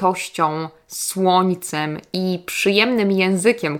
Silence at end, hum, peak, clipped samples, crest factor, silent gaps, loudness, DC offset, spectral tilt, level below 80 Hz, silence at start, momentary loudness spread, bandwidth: 0 s; none; 0 dBFS; under 0.1%; 18 dB; none; -19 LUFS; under 0.1%; -4.5 dB/octave; -64 dBFS; 0 s; 9 LU; 18.5 kHz